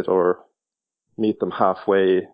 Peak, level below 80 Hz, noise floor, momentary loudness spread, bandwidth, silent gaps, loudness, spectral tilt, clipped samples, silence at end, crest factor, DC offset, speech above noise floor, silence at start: -4 dBFS; -62 dBFS; -87 dBFS; 7 LU; 5.2 kHz; none; -21 LUFS; -9.5 dB/octave; under 0.1%; 0.1 s; 18 dB; under 0.1%; 67 dB; 0 s